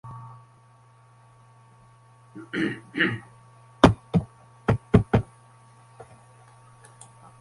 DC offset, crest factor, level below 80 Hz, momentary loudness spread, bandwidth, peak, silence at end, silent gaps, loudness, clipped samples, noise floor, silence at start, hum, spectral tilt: under 0.1%; 28 dB; -42 dBFS; 25 LU; 11.5 kHz; 0 dBFS; 2.2 s; none; -24 LUFS; under 0.1%; -55 dBFS; 0.05 s; none; -7 dB/octave